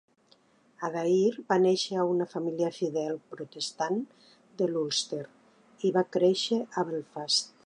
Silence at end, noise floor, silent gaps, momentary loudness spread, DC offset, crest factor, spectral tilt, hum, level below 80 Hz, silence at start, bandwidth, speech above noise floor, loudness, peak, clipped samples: 0.15 s; -64 dBFS; none; 11 LU; under 0.1%; 18 dB; -4.5 dB/octave; none; -82 dBFS; 0.8 s; 10.5 kHz; 36 dB; -29 LUFS; -12 dBFS; under 0.1%